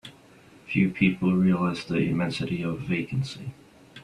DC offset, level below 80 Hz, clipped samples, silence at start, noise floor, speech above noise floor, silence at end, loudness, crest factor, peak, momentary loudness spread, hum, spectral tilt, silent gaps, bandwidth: under 0.1%; -56 dBFS; under 0.1%; 0.05 s; -53 dBFS; 28 dB; 0 s; -26 LUFS; 20 dB; -6 dBFS; 12 LU; none; -7 dB/octave; none; 10.5 kHz